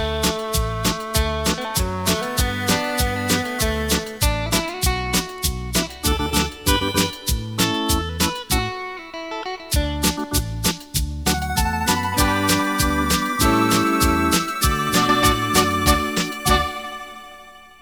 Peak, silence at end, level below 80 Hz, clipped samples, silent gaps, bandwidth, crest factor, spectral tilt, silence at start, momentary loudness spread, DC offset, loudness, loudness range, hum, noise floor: -2 dBFS; 0.15 s; -28 dBFS; under 0.1%; none; over 20 kHz; 18 dB; -3.5 dB/octave; 0 s; 7 LU; 0.2%; -20 LUFS; 5 LU; none; -43 dBFS